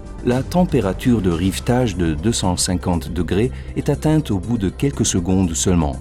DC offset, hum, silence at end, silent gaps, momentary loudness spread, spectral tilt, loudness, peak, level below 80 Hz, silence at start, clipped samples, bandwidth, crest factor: under 0.1%; none; 0 s; none; 5 LU; -5.5 dB/octave; -19 LUFS; -4 dBFS; -30 dBFS; 0 s; under 0.1%; 16 kHz; 14 dB